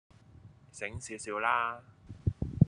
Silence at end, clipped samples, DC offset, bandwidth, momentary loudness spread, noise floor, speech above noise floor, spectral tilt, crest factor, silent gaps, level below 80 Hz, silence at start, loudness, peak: 0 s; under 0.1%; under 0.1%; 11 kHz; 19 LU; -56 dBFS; 21 dB; -6 dB/octave; 26 dB; none; -50 dBFS; 0.45 s; -34 LUFS; -8 dBFS